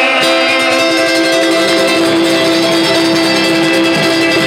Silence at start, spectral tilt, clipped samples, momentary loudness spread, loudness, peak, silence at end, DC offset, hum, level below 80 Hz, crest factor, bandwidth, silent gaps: 0 s; -3 dB/octave; under 0.1%; 1 LU; -10 LUFS; 0 dBFS; 0 s; under 0.1%; none; -56 dBFS; 10 dB; 16.5 kHz; none